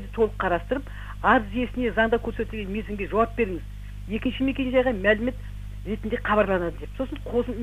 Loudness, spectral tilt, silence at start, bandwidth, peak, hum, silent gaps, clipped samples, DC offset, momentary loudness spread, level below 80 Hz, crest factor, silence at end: -25 LUFS; -7 dB/octave; 0 s; 15 kHz; -6 dBFS; 50 Hz at -35 dBFS; none; under 0.1%; under 0.1%; 12 LU; -36 dBFS; 20 dB; 0 s